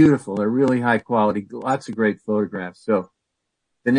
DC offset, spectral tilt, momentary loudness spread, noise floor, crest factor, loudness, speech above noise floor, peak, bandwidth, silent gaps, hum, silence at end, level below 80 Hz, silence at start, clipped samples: under 0.1%; -7.5 dB/octave; 9 LU; -78 dBFS; 16 dB; -21 LUFS; 58 dB; -4 dBFS; 10.5 kHz; none; none; 0 s; -62 dBFS; 0 s; under 0.1%